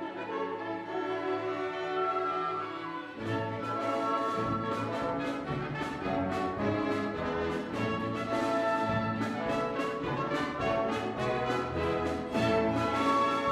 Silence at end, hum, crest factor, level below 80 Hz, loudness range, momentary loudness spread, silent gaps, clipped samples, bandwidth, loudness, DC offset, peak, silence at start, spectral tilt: 0 s; none; 16 dB; -56 dBFS; 2 LU; 7 LU; none; under 0.1%; 14.5 kHz; -32 LUFS; under 0.1%; -16 dBFS; 0 s; -6 dB/octave